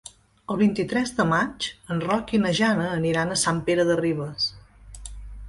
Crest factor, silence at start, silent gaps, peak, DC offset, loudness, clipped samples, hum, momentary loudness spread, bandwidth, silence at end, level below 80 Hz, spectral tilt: 16 dB; 0.5 s; none; -8 dBFS; under 0.1%; -24 LUFS; under 0.1%; none; 13 LU; 11.5 kHz; 0 s; -48 dBFS; -4.5 dB/octave